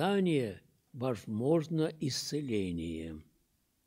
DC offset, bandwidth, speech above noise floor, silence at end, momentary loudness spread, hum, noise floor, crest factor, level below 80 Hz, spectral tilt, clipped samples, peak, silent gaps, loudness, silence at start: under 0.1%; 16 kHz; 42 dB; 0.65 s; 15 LU; none; -75 dBFS; 18 dB; -62 dBFS; -6 dB/octave; under 0.1%; -16 dBFS; none; -34 LUFS; 0 s